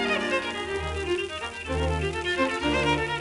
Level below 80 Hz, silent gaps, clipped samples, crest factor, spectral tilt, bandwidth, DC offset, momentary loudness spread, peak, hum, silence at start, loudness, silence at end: -38 dBFS; none; under 0.1%; 16 dB; -4.5 dB/octave; 11.5 kHz; under 0.1%; 6 LU; -12 dBFS; none; 0 s; -27 LUFS; 0 s